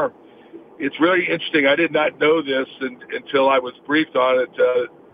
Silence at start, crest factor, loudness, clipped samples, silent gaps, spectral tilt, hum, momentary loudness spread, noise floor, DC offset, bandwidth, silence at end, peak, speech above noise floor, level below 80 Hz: 0 s; 16 dB; -19 LUFS; under 0.1%; none; -7.5 dB/octave; none; 11 LU; -43 dBFS; under 0.1%; 5 kHz; 0.25 s; -2 dBFS; 24 dB; -68 dBFS